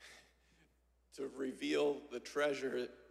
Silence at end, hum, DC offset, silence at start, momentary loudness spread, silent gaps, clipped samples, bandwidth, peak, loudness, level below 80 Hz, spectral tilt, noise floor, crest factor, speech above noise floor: 0.05 s; none; under 0.1%; 0 s; 12 LU; none; under 0.1%; 14 kHz; -24 dBFS; -39 LUFS; -76 dBFS; -3.5 dB/octave; -73 dBFS; 16 dB; 35 dB